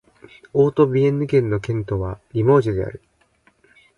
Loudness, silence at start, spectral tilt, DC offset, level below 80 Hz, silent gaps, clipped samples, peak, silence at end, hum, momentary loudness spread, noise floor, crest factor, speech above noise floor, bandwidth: -19 LUFS; 0.55 s; -9 dB/octave; under 0.1%; -44 dBFS; none; under 0.1%; -4 dBFS; 1 s; none; 10 LU; -60 dBFS; 18 dB; 41 dB; 7.2 kHz